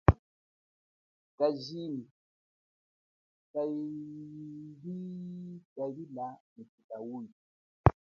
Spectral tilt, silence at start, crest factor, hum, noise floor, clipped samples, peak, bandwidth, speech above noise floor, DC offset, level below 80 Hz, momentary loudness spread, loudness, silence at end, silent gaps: -7.5 dB/octave; 0.1 s; 32 dB; none; under -90 dBFS; under 0.1%; -4 dBFS; 6.8 kHz; over 52 dB; under 0.1%; -46 dBFS; 18 LU; -37 LUFS; 0.3 s; 0.19-1.38 s, 2.11-3.54 s, 5.65-5.76 s, 6.40-6.56 s, 6.69-6.78 s, 6.84-6.89 s, 7.32-7.84 s